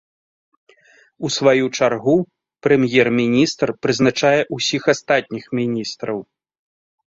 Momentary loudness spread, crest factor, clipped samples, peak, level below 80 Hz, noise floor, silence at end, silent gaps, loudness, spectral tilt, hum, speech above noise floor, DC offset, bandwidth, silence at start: 10 LU; 18 dB; under 0.1%; -2 dBFS; -58 dBFS; -53 dBFS; 0.9 s; none; -18 LUFS; -4.5 dB/octave; none; 35 dB; under 0.1%; 7.8 kHz; 1.2 s